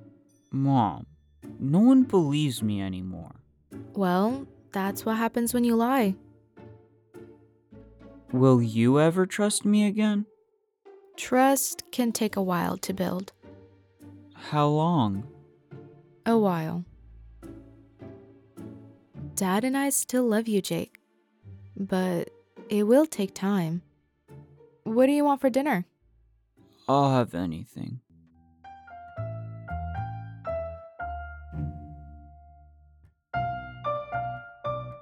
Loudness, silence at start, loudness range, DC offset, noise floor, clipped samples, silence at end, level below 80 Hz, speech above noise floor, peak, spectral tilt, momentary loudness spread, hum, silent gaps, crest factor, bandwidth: -26 LUFS; 0 s; 12 LU; under 0.1%; -69 dBFS; under 0.1%; 0 s; -54 dBFS; 45 dB; -6 dBFS; -6 dB/octave; 22 LU; none; none; 20 dB; 18.5 kHz